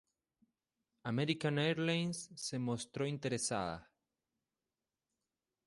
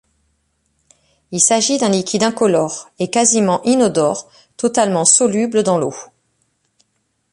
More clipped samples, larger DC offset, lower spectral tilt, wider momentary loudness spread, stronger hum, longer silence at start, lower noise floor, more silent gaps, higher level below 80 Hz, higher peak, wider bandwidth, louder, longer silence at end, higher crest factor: neither; neither; about the same, -4.5 dB/octave vs -3.5 dB/octave; second, 8 LU vs 12 LU; neither; second, 1.05 s vs 1.3 s; first, under -90 dBFS vs -67 dBFS; neither; second, -72 dBFS vs -60 dBFS; second, -22 dBFS vs 0 dBFS; about the same, 11.5 kHz vs 11.5 kHz; second, -38 LUFS vs -15 LUFS; first, 1.85 s vs 1.3 s; about the same, 20 dB vs 18 dB